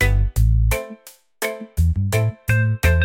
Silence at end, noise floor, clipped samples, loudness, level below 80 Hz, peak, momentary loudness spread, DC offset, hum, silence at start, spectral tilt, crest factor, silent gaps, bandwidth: 0 s; -43 dBFS; under 0.1%; -20 LUFS; -22 dBFS; -4 dBFS; 9 LU; under 0.1%; none; 0 s; -5.5 dB/octave; 14 dB; none; 17 kHz